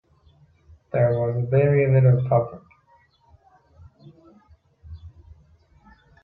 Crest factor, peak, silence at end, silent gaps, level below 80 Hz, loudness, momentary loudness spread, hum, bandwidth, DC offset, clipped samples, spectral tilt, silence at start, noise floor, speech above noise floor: 18 dB; -8 dBFS; 1.15 s; none; -54 dBFS; -20 LUFS; 25 LU; none; 3.6 kHz; under 0.1%; under 0.1%; -12.5 dB/octave; 0.95 s; -59 dBFS; 40 dB